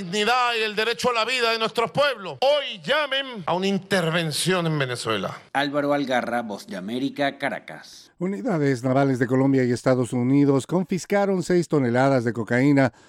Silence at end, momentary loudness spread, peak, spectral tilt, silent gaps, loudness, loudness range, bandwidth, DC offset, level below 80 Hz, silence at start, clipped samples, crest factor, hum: 0.2 s; 8 LU; -6 dBFS; -5.5 dB/octave; none; -22 LUFS; 5 LU; 14.5 kHz; under 0.1%; -64 dBFS; 0 s; under 0.1%; 16 dB; none